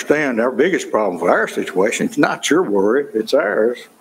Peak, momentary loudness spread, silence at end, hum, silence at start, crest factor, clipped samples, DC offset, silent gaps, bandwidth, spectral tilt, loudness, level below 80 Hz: 0 dBFS; 3 LU; 0.15 s; none; 0 s; 16 dB; under 0.1%; under 0.1%; none; 16 kHz; -4 dB/octave; -17 LUFS; -62 dBFS